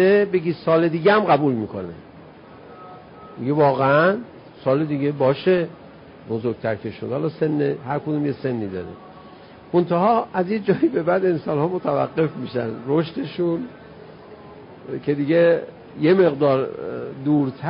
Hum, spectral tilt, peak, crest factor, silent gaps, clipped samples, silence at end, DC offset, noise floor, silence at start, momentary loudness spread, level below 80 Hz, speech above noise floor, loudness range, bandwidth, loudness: none; -12 dB/octave; -4 dBFS; 16 dB; none; under 0.1%; 0 s; under 0.1%; -43 dBFS; 0 s; 18 LU; -58 dBFS; 23 dB; 4 LU; 5.4 kHz; -21 LUFS